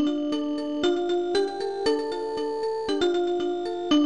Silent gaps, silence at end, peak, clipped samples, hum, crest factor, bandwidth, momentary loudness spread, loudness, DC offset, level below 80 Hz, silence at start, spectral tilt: none; 0 s; -14 dBFS; under 0.1%; none; 12 dB; 10 kHz; 5 LU; -26 LUFS; 0.4%; -58 dBFS; 0 s; -4 dB/octave